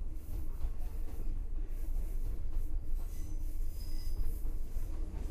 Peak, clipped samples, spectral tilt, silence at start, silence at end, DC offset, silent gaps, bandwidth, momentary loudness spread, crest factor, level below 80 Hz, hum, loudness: -22 dBFS; under 0.1%; -6.5 dB/octave; 0 s; 0 s; under 0.1%; none; 14.5 kHz; 3 LU; 12 dB; -34 dBFS; none; -43 LUFS